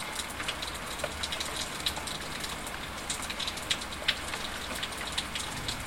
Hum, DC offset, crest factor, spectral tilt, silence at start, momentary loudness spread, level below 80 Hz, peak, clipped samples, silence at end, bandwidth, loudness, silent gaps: none; 0.2%; 24 dB; -1.5 dB/octave; 0 s; 5 LU; -48 dBFS; -12 dBFS; under 0.1%; 0 s; 17 kHz; -33 LUFS; none